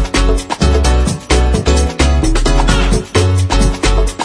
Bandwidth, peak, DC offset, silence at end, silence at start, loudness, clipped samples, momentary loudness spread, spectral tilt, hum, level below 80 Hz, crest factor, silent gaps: 11 kHz; 0 dBFS; under 0.1%; 0 s; 0 s; -13 LUFS; under 0.1%; 2 LU; -5 dB/octave; none; -14 dBFS; 12 dB; none